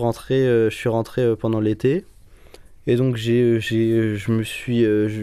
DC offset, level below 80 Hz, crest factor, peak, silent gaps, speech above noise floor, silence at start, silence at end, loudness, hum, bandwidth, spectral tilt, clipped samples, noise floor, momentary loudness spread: under 0.1%; -48 dBFS; 12 dB; -8 dBFS; none; 25 dB; 0 s; 0 s; -20 LUFS; none; 14 kHz; -7.5 dB/octave; under 0.1%; -45 dBFS; 5 LU